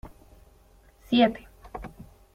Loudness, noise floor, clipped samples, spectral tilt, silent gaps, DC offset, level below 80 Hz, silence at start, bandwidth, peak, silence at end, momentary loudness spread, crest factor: -24 LUFS; -57 dBFS; under 0.1%; -6.5 dB/octave; none; under 0.1%; -52 dBFS; 0.05 s; 13.5 kHz; -8 dBFS; 0.45 s; 22 LU; 22 dB